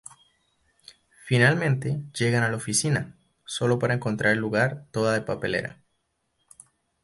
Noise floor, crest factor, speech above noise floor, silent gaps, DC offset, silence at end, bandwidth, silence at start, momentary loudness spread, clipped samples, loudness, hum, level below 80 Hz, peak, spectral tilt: -75 dBFS; 20 dB; 51 dB; none; under 0.1%; 1.3 s; 11.5 kHz; 1.25 s; 9 LU; under 0.1%; -25 LUFS; none; -60 dBFS; -6 dBFS; -5 dB/octave